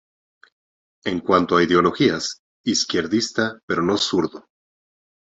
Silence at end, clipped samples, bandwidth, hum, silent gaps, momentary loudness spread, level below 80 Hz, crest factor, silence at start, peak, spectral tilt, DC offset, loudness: 1 s; under 0.1%; 8.2 kHz; none; 2.39-2.64 s, 3.63-3.68 s; 11 LU; -54 dBFS; 20 dB; 1.05 s; -2 dBFS; -4 dB/octave; under 0.1%; -20 LUFS